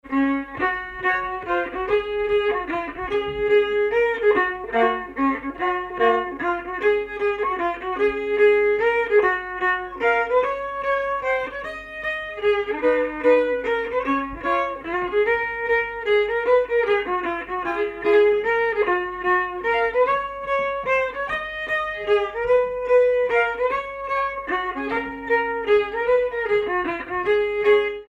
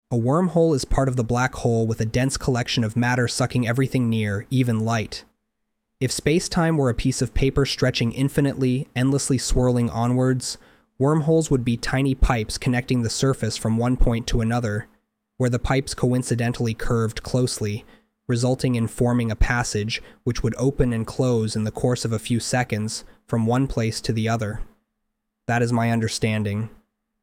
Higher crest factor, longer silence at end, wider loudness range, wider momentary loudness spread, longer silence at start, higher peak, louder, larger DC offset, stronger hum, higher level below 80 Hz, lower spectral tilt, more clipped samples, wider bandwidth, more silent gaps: about the same, 14 dB vs 16 dB; second, 0.05 s vs 0.55 s; about the same, 2 LU vs 3 LU; about the same, 7 LU vs 6 LU; about the same, 0.05 s vs 0.1 s; about the same, -6 dBFS vs -6 dBFS; about the same, -22 LUFS vs -23 LUFS; neither; neither; second, -48 dBFS vs -34 dBFS; about the same, -5.5 dB/octave vs -5.5 dB/octave; neither; second, 7.4 kHz vs 15.5 kHz; neither